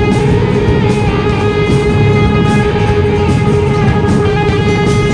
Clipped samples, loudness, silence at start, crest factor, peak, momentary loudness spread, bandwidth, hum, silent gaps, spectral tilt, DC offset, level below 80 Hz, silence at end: under 0.1%; -11 LUFS; 0 s; 8 dB; -2 dBFS; 2 LU; 10.5 kHz; none; none; -7 dB/octave; under 0.1%; -22 dBFS; 0 s